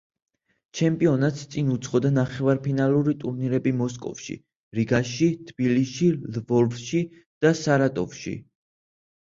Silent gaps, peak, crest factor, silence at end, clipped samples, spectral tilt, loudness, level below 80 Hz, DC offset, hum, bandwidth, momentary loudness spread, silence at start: 4.56-4.71 s, 7.26-7.41 s; -8 dBFS; 18 dB; 0.85 s; under 0.1%; -6.5 dB/octave; -24 LUFS; -58 dBFS; under 0.1%; none; 7.6 kHz; 13 LU; 0.75 s